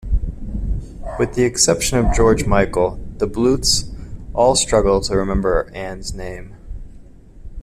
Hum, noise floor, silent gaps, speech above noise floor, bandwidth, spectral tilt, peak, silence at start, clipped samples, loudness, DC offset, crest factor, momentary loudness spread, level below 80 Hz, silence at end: none; -40 dBFS; none; 23 dB; 14.5 kHz; -4 dB/octave; -2 dBFS; 0 s; under 0.1%; -18 LUFS; under 0.1%; 18 dB; 18 LU; -26 dBFS; 0 s